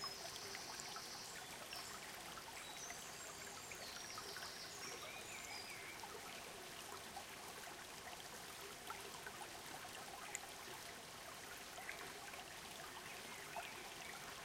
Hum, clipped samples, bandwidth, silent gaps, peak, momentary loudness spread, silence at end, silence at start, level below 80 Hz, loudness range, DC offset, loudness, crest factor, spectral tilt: none; under 0.1%; 16.5 kHz; none; -26 dBFS; 3 LU; 0 s; 0 s; -76 dBFS; 2 LU; under 0.1%; -50 LUFS; 26 dB; -1 dB/octave